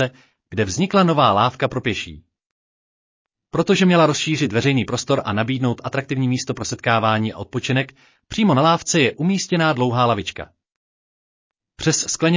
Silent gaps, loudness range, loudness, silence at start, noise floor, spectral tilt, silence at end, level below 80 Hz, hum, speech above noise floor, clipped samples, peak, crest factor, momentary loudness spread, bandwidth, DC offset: 2.51-3.25 s, 10.76-11.50 s; 2 LU; -19 LUFS; 0 s; under -90 dBFS; -5 dB/octave; 0 s; -50 dBFS; none; over 71 dB; under 0.1%; -4 dBFS; 16 dB; 11 LU; 7.8 kHz; under 0.1%